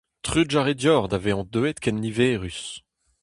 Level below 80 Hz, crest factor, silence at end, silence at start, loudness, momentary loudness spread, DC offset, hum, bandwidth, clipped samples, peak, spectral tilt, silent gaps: -46 dBFS; 18 dB; 0.45 s; 0.25 s; -23 LUFS; 12 LU; under 0.1%; none; 11.5 kHz; under 0.1%; -6 dBFS; -5 dB/octave; none